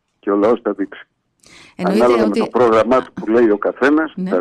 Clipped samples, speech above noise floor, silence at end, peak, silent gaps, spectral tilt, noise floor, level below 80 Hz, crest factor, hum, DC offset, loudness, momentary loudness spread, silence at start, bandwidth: under 0.1%; 32 dB; 0 s; -4 dBFS; none; -7 dB/octave; -47 dBFS; -52 dBFS; 10 dB; none; under 0.1%; -16 LUFS; 8 LU; 0.25 s; 12 kHz